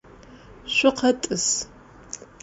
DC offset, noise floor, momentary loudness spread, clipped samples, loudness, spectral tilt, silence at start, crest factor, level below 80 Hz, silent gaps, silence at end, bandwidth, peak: under 0.1%; -47 dBFS; 19 LU; under 0.1%; -22 LUFS; -2 dB/octave; 0.3 s; 20 dB; -54 dBFS; none; 0.2 s; 8 kHz; -6 dBFS